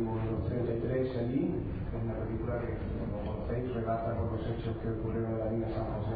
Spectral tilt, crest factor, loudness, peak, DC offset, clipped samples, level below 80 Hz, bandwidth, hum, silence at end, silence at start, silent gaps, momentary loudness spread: -8.5 dB/octave; 14 dB; -34 LUFS; -20 dBFS; under 0.1%; under 0.1%; -44 dBFS; 4.9 kHz; none; 0 s; 0 s; none; 4 LU